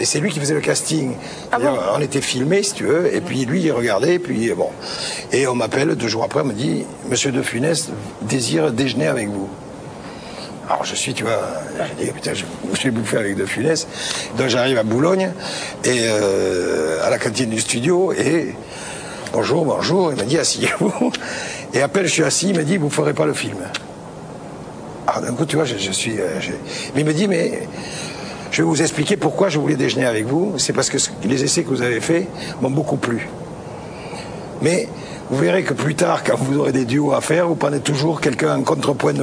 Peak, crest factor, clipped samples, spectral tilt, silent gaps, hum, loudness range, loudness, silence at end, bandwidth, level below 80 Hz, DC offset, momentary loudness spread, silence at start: -2 dBFS; 18 dB; under 0.1%; -4.5 dB/octave; none; none; 4 LU; -19 LUFS; 0 s; 11 kHz; -54 dBFS; under 0.1%; 12 LU; 0 s